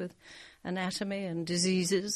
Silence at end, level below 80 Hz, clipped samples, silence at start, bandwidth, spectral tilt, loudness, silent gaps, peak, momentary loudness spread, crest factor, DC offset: 0 s; -68 dBFS; under 0.1%; 0 s; 13 kHz; -4 dB/octave; -32 LUFS; none; -16 dBFS; 18 LU; 16 dB; under 0.1%